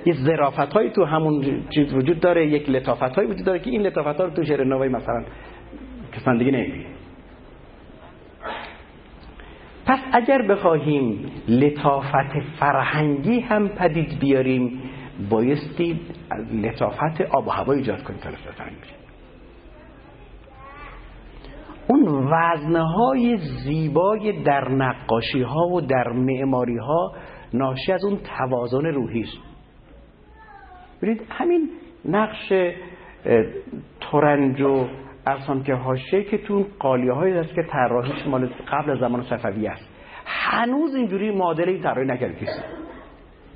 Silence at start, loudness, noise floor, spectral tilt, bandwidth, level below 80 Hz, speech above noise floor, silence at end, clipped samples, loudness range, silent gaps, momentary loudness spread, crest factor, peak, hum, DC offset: 0 s; -22 LUFS; -47 dBFS; -11.5 dB/octave; 5.2 kHz; -48 dBFS; 26 dB; 0.3 s; under 0.1%; 7 LU; none; 16 LU; 20 dB; -2 dBFS; none; under 0.1%